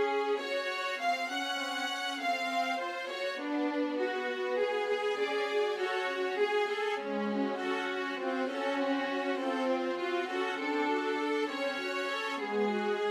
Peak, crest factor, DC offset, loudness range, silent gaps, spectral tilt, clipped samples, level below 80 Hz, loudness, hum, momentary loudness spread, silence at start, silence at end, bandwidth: -20 dBFS; 12 dB; under 0.1%; 1 LU; none; -3.5 dB/octave; under 0.1%; under -90 dBFS; -32 LUFS; none; 3 LU; 0 s; 0 s; 15.5 kHz